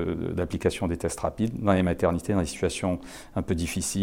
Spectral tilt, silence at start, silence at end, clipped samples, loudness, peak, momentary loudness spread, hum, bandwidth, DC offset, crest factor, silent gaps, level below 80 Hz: -5.5 dB/octave; 0 s; 0 s; under 0.1%; -27 LUFS; -8 dBFS; 6 LU; none; 16.5 kHz; under 0.1%; 18 dB; none; -44 dBFS